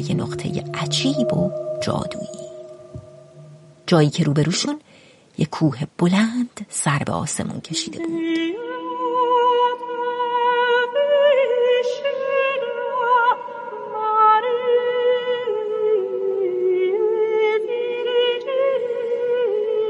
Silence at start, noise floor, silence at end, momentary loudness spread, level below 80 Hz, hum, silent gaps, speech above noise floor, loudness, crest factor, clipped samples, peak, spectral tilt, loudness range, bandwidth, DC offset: 0 s; -50 dBFS; 0 s; 10 LU; -58 dBFS; none; none; 29 dB; -20 LUFS; 18 dB; under 0.1%; -2 dBFS; -5 dB/octave; 5 LU; 11.5 kHz; under 0.1%